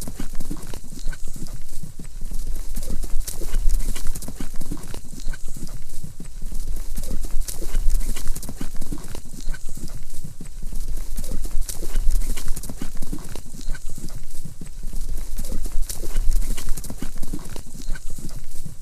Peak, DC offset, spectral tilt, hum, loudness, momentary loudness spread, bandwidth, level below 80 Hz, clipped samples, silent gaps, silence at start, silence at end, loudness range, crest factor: -2 dBFS; under 0.1%; -4 dB/octave; none; -33 LUFS; 10 LU; 14 kHz; -22 dBFS; under 0.1%; none; 0 s; 0 s; 3 LU; 14 dB